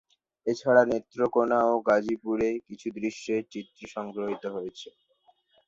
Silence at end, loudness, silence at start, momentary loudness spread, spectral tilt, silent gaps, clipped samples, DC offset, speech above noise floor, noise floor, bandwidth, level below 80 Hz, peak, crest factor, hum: 0.8 s; -27 LUFS; 0.45 s; 17 LU; -5.5 dB/octave; none; under 0.1%; under 0.1%; 39 dB; -66 dBFS; 7.8 kHz; -66 dBFS; -6 dBFS; 22 dB; none